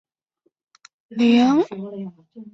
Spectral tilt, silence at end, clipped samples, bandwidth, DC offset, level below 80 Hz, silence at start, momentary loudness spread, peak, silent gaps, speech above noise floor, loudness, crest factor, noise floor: -6 dB/octave; 0.05 s; under 0.1%; 7.6 kHz; under 0.1%; -66 dBFS; 1.1 s; 19 LU; -6 dBFS; none; 50 dB; -18 LUFS; 16 dB; -70 dBFS